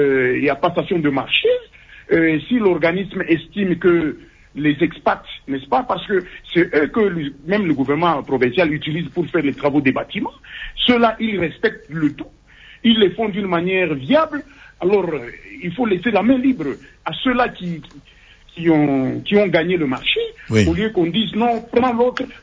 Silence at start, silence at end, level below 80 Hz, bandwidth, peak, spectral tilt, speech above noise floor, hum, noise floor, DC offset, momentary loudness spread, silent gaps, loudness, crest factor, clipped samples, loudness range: 0 s; 0.05 s; -44 dBFS; 8 kHz; -2 dBFS; -7 dB/octave; 24 dB; none; -43 dBFS; under 0.1%; 10 LU; none; -18 LUFS; 16 dB; under 0.1%; 2 LU